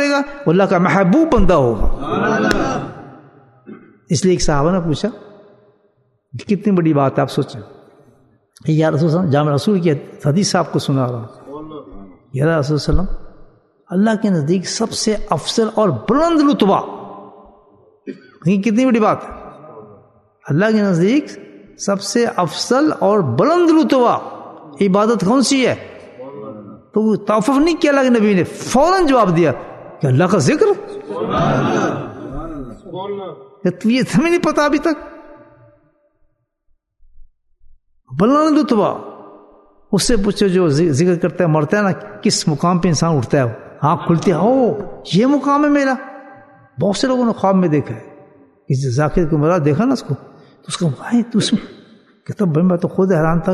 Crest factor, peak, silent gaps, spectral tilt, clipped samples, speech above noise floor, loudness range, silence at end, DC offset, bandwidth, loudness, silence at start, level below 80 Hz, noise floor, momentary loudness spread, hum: 16 dB; 0 dBFS; none; -6 dB/octave; under 0.1%; 46 dB; 5 LU; 0 s; under 0.1%; 12.5 kHz; -16 LUFS; 0 s; -34 dBFS; -61 dBFS; 17 LU; none